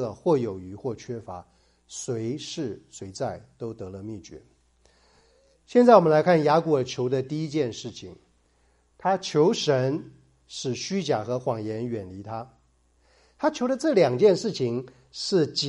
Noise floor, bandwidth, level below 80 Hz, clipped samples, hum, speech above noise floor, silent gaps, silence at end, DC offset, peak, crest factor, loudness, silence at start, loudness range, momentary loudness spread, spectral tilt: -65 dBFS; 11.5 kHz; -64 dBFS; under 0.1%; none; 40 dB; none; 0 s; under 0.1%; -2 dBFS; 24 dB; -24 LUFS; 0 s; 13 LU; 18 LU; -5.5 dB/octave